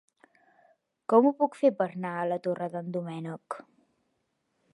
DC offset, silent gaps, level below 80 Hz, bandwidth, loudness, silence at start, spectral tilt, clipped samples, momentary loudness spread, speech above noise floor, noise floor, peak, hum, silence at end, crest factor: under 0.1%; none; -84 dBFS; 11 kHz; -28 LUFS; 1.1 s; -8 dB/octave; under 0.1%; 18 LU; 49 dB; -77 dBFS; -8 dBFS; none; 1.1 s; 22 dB